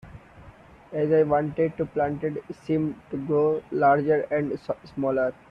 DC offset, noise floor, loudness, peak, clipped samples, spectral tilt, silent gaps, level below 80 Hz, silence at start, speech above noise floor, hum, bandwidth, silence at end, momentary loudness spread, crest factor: under 0.1%; -49 dBFS; -25 LUFS; -8 dBFS; under 0.1%; -9.5 dB/octave; none; -58 dBFS; 0.05 s; 25 dB; none; 6 kHz; 0.2 s; 11 LU; 16 dB